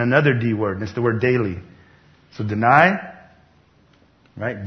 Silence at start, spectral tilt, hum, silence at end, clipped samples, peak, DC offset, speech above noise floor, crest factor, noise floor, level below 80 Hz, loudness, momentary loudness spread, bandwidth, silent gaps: 0 s; -8 dB/octave; none; 0 s; under 0.1%; 0 dBFS; under 0.1%; 37 dB; 20 dB; -55 dBFS; -54 dBFS; -19 LUFS; 16 LU; 6.4 kHz; none